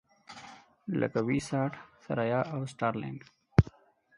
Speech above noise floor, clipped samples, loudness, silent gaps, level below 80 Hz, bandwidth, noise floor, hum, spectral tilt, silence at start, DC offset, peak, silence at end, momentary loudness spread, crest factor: 23 dB; under 0.1%; -31 LUFS; none; -48 dBFS; 11 kHz; -55 dBFS; none; -7.5 dB/octave; 0.3 s; under 0.1%; -6 dBFS; 0.5 s; 21 LU; 26 dB